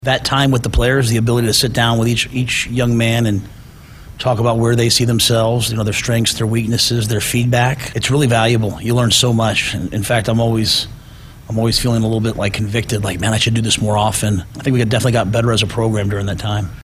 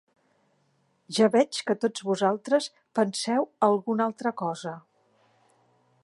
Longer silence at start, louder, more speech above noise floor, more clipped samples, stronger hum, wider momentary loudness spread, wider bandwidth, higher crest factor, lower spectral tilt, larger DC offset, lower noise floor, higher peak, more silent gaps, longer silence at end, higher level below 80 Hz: second, 0 s vs 1.1 s; first, -15 LUFS vs -26 LUFS; second, 22 dB vs 44 dB; neither; neither; second, 6 LU vs 10 LU; first, 15.5 kHz vs 11.5 kHz; about the same, 16 dB vs 20 dB; about the same, -4.5 dB/octave vs -4.5 dB/octave; neither; second, -37 dBFS vs -69 dBFS; first, 0 dBFS vs -8 dBFS; neither; second, 0 s vs 1.25 s; first, -34 dBFS vs -82 dBFS